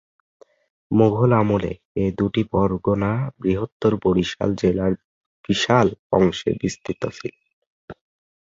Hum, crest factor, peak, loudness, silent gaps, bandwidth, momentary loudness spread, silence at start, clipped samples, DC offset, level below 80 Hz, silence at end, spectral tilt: none; 20 dB; -2 dBFS; -21 LUFS; 1.85-1.95 s, 3.72-3.80 s, 5.04-5.44 s, 5.99-6.10 s, 7.53-7.88 s; 7.8 kHz; 11 LU; 0.9 s; under 0.1%; under 0.1%; -44 dBFS; 0.5 s; -6.5 dB/octave